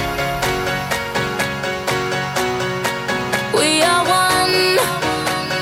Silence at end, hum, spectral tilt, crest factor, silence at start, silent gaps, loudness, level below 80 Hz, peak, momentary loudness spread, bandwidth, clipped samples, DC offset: 0 s; none; -3 dB/octave; 16 dB; 0 s; none; -17 LUFS; -42 dBFS; -2 dBFS; 7 LU; 16.5 kHz; under 0.1%; under 0.1%